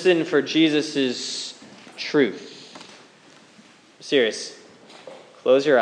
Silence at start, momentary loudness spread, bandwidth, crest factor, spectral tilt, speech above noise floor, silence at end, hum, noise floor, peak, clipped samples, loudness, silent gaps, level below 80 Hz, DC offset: 0 s; 24 LU; 10.5 kHz; 18 dB; -4 dB/octave; 31 dB; 0 s; none; -51 dBFS; -4 dBFS; under 0.1%; -22 LUFS; none; -84 dBFS; under 0.1%